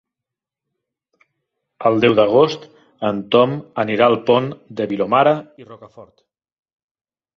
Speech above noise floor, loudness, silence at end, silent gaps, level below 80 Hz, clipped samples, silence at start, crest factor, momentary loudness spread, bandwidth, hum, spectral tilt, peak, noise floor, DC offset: 69 dB; -17 LUFS; 1.3 s; none; -60 dBFS; under 0.1%; 1.8 s; 18 dB; 10 LU; 6.4 kHz; none; -7 dB/octave; -2 dBFS; -86 dBFS; under 0.1%